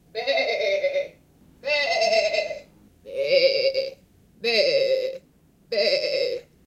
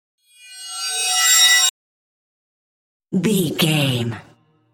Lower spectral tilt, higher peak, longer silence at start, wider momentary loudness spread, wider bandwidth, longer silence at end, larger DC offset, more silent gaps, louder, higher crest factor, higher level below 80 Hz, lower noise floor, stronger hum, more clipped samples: about the same, -1.5 dB/octave vs -2 dB/octave; second, -8 dBFS vs -2 dBFS; second, 0.15 s vs 0.45 s; second, 14 LU vs 18 LU; second, 12.5 kHz vs 17 kHz; second, 0.25 s vs 0.55 s; neither; second, none vs 1.70-3.00 s; second, -23 LUFS vs -16 LUFS; about the same, 18 dB vs 18 dB; about the same, -64 dBFS vs -62 dBFS; first, -58 dBFS vs -39 dBFS; neither; neither